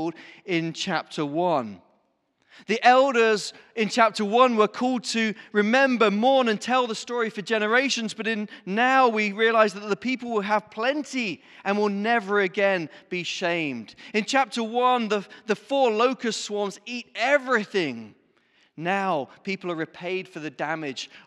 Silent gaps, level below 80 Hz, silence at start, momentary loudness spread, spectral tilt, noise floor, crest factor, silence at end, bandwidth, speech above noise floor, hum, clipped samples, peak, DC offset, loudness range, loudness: none; -80 dBFS; 0 s; 11 LU; -4 dB/octave; -70 dBFS; 20 dB; 0.1 s; 12 kHz; 46 dB; none; under 0.1%; -4 dBFS; under 0.1%; 5 LU; -24 LUFS